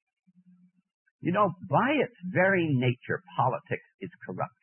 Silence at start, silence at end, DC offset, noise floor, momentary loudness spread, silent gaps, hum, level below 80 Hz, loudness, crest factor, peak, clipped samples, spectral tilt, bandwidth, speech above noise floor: 1.25 s; 0.15 s; under 0.1%; -61 dBFS; 13 LU; 3.94-3.99 s; none; -72 dBFS; -28 LUFS; 18 dB; -10 dBFS; under 0.1%; -11 dB/octave; 3.3 kHz; 34 dB